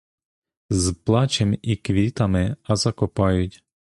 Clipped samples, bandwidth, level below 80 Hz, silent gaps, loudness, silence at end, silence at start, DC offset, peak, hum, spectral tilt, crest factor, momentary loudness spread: under 0.1%; 11.5 kHz; -38 dBFS; none; -22 LUFS; 0.5 s; 0.7 s; under 0.1%; -4 dBFS; none; -5.5 dB/octave; 18 dB; 5 LU